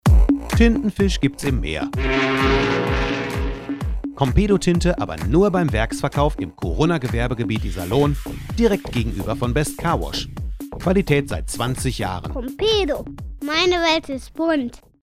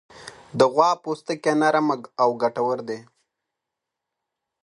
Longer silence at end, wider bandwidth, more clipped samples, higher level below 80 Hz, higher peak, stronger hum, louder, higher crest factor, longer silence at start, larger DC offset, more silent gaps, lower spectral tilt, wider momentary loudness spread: second, 0.25 s vs 1.65 s; first, 15.5 kHz vs 11.5 kHz; neither; first, -26 dBFS vs -70 dBFS; about the same, -2 dBFS vs -2 dBFS; neither; about the same, -21 LUFS vs -22 LUFS; about the same, 18 dB vs 22 dB; about the same, 0.05 s vs 0.15 s; neither; neither; about the same, -6 dB/octave vs -5 dB/octave; second, 10 LU vs 16 LU